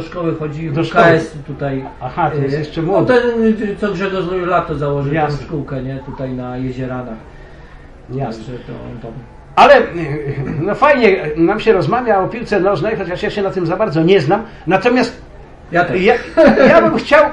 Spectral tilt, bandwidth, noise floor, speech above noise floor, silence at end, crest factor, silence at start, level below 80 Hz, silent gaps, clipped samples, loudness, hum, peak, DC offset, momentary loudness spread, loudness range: -7 dB/octave; 10.5 kHz; -36 dBFS; 22 dB; 0 s; 14 dB; 0 s; -38 dBFS; none; under 0.1%; -14 LUFS; none; 0 dBFS; under 0.1%; 14 LU; 11 LU